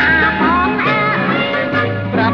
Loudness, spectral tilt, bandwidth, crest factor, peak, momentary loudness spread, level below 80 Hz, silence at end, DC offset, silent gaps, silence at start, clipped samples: -14 LUFS; -7.5 dB/octave; 6.6 kHz; 12 dB; -2 dBFS; 5 LU; -36 dBFS; 0 s; under 0.1%; none; 0 s; under 0.1%